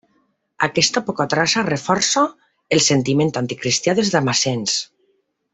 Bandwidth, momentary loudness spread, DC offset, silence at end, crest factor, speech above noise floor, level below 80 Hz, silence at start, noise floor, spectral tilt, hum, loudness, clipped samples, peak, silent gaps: 8.4 kHz; 6 LU; under 0.1%; 0.7 s; 18 dB; 47 dB; -58 dBFS; 0.6 s; -65 dBFS; -3.5 dB/octave; none; -18 LUFS; under 0.1%; -2 dBFS; none